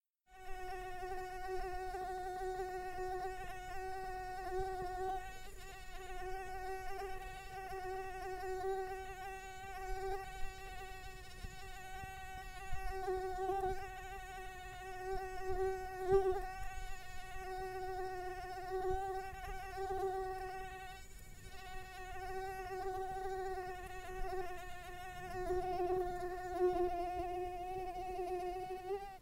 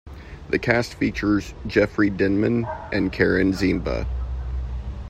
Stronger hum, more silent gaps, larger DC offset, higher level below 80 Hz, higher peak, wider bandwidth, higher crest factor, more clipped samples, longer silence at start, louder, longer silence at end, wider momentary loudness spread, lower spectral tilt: neither; neither; neither; second, -52 dBFS vs -34 dBFS; second, -20 dBFS vs -2 dBFS; first, 16 kHz vs 13.5 kHz; about the same, 22 dB vs 20 dB; neither; first, 0.3 s vs 0.05 s; second, -43 LUFS vs -23 LUFS; about the same, 0 s vs 0 s; about the same, 11 LU vs 11 LU; second, -5 dB/octave vs -7 dB/octave